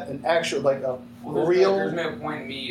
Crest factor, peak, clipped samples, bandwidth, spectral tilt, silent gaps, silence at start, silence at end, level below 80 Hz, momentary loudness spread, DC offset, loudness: 16 dB; -8 dBFS; under 0.1%; 12.5 kHz; -5 dB/octave; none; 0 s; 0 s; -64 dBFS; 11 LU; under 0.1%; -24 LUFS